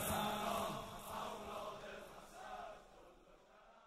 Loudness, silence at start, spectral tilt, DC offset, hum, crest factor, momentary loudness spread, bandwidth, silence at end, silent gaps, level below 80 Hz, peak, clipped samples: -46 LUFS; 0 s; -3.5 dB/octave; under 0.1%; none; 20 dB; 24 LU; 16 kHz; 0 s; none; -64 dBFS; -26 dBFS; under 0.1%